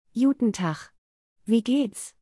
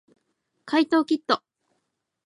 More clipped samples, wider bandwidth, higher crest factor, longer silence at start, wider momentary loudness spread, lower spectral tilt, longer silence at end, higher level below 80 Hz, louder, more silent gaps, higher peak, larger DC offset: neither; about the same, 12 kHz vs 11 kHz; second, 16 dB vs 22 dB; second, 0.15 s vs 0.65 s; first, 12 LU vs 5 LU; first, -5.5 dB/octave vs -4 dB/octave; second, 0.15 s vs 0.9 s; first, -66 dBFS vs -80 dBFS; about the same, -25 LUFS vs -24 LUFS; first, 0.98-1.36 s vs none; second, -10 dBFS vs -4 dBFS; neither